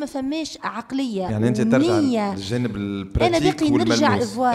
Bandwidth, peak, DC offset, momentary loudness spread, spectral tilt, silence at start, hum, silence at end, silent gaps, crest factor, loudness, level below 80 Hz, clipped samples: 13.5 kHz; -4 dBFS; under 0.1%; 9 LU; -5.5 dB/octave; 0 s; none; 0 s; none; 16 dB; -21 LUFS; -40 dBFS; under 0.1%